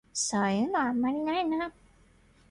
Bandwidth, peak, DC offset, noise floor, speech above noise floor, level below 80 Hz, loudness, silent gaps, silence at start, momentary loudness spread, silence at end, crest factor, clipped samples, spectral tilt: 11.5 kHz; -16 dBFS; under 0.1%; -61 dBFS; 32 dB; -62 dBFS; -29 LUFS; none; 0.15 s; 5 LU; 0.8 s; 14 dB; under 0.1%; -4 dB/octave